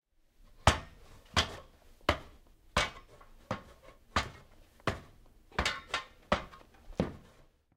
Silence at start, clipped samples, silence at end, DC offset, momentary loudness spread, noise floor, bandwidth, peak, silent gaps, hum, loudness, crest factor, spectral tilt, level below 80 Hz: 0.6 s; under 0.1%; 0.6 s; under 0.1%; 16 LU; -62 dBFS; 16 kHz; -8 dBFS; none; none; -35 LUFS; 30 dB; -3.5 dB/octave; -48 dBFS